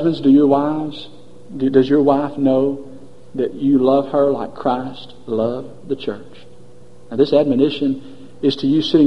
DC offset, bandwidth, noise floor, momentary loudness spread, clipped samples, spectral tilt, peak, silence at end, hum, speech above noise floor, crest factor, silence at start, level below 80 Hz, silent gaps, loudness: 1%; 6.2 kHz; -45 dBFS; 16 LU; under 0.1%; -8 dB/octave; 0 dBFS; 0 s; none; 28 dB; 18 dB; 0 s; -52 dBFS; none; -17 LUFS